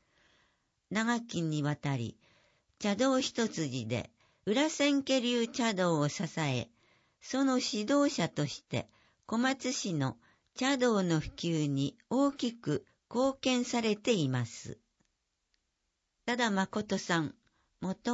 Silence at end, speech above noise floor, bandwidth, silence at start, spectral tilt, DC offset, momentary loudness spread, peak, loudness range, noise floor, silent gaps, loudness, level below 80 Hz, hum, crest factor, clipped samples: 0 s; 51 dB; 8 kHz; 0.9 s; -5 dB/octave; under 0.1%; 10 LU; -14 dBFS; 4 LU; -82 dBFS; none; -32 LUFS; -66 dBFS; none; 18 dB; under 0.1%